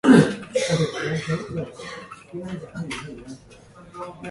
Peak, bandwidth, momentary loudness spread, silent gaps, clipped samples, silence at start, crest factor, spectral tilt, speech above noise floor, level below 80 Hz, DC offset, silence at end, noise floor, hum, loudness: 0 dBFS; 11.5 kHz; 18 LU; none; under 0.1%; 0.05 s; 22 dB; -6 dB/octave; 17 dB; -54 dBFS; under 0.1%; 0 s; -47 dBFS; none; -24 LUFS